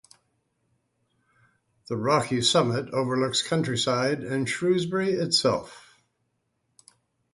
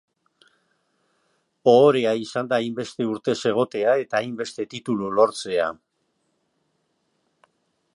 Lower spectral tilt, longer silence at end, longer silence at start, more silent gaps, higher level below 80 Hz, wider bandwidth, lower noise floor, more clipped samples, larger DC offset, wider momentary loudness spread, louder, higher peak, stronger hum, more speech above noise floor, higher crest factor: second, -4 dB/octave vs -5.5 dB/octave; second, 1.55 s vs 2.2 s; first, 1.9 s vs 1.65 s; neither; first, -64 dBFS vs -70 dBFS; about the same, 11.5 kHz vs 11 kHz; about the same, -75 dBFS vs -72 dBFS; neither; neither; second, 6 LU vs 13 LU; second, -25 LUFS vs -22 LUFS; second, -8 dBFS vs -2 dBFS; neither; about the same, 50 dB vs 51 dB; about the same, 20 dB vs 22 dB